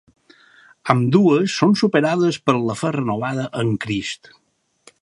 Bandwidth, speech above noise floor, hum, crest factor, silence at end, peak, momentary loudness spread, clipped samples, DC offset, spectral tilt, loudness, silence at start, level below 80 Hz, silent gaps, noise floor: 11.5 kHz; 35 dB; none; 20 dB; 0.9 s; 0 dBFS; 10 LU; under 0.1%; under 0.1%; -6 dB/octave; -19 LUFS; 0.85 s; -58 dBFS; none; -53 dBFS